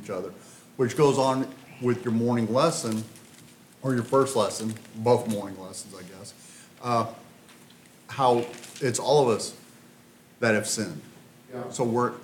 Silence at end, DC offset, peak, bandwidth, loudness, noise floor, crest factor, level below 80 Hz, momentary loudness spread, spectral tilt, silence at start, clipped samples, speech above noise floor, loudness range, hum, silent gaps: 0 s; under 0.1%; -8 dBFS; 18 kHz; -26 LUFS; -54 dBFS; 20 dB; -72 dBFS; 21 LU; -5 dB/octave; 0 s; under 0.1%; 28 dB; 4 LU; none; none